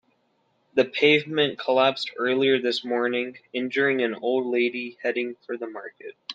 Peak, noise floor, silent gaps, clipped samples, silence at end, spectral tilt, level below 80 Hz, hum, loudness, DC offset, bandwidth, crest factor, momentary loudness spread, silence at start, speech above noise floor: -6 dBFS; -69 dBFS; none; under 0.1%; 0 s; -5 dB/octave; -74 dBFS; none; -24 LUFS; under 0.1%; 8.8 kHz; 20 dB; 13 LU; 0.75 s; 44 dB